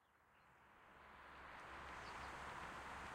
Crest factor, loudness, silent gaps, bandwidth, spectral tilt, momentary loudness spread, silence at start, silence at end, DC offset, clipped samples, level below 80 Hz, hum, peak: 16 dB; -54 LUFS; none; 16 kHz; -3.5 dB/octave; 15 LU; 0 s; 0 s; under 0.1%; under 0.1%; -68 dBFS; none; -40 dBFS